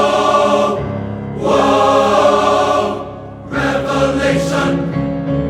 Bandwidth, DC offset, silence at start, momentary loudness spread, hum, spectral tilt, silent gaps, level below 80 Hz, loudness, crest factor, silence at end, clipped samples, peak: 14 kHz; under 0.1%; 0 s; 12 LU; none; -5.5 dB/octave; none; -36 dBFS; -14 LUFS; 14 dB; 0 s; under 0.1%; 0 dBFS